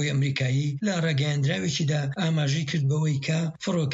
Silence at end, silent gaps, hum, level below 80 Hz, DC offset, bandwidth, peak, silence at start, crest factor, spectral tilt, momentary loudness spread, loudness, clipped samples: 0 s; none; none; -62 dBFS; under 0.1%; 8 kHz; -14 dBFS; 0 s; 10 dB; -5.5 dB/octave; 2 LU; -26 LUFS; under 0.1%